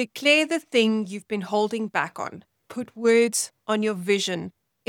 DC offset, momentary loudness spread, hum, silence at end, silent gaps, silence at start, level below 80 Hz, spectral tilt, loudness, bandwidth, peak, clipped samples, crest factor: under 0.1%; 16 LU; none; 0.4 s; none; 0 s; -76 dBFS; -3.5 dB/octave; -23 LUFS; 18 kHz; -6 dBFS; under 0.1%; 18 dB